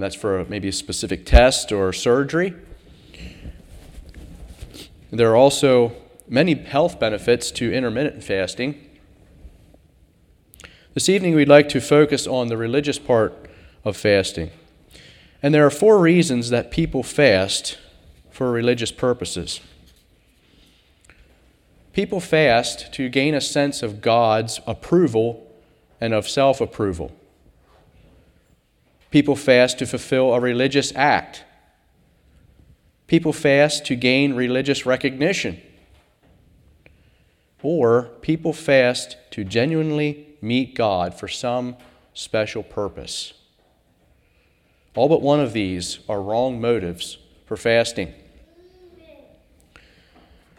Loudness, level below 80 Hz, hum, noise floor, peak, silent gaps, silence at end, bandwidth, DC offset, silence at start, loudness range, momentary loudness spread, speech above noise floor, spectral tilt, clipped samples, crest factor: -19 LUFS; -36 dBFS; none; -61 dBFS; 0 dBFS; none; 2.45 s; 16.5 kHz; under 0.1%; 0 s; 8 LU; 15 LU; 42 dB; -5 dB/octave; under 0.1%; 20 dB